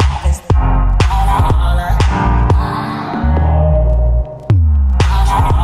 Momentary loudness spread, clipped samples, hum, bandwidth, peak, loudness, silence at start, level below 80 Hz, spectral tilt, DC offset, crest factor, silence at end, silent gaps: 5 LU; under 0.1%; none; 12.5 kHz; 0 dBFS; -14 LUFS; 0 s; -14 dBFS; -7 dB/octave; under 0.1%; 12 dB; 0 s; none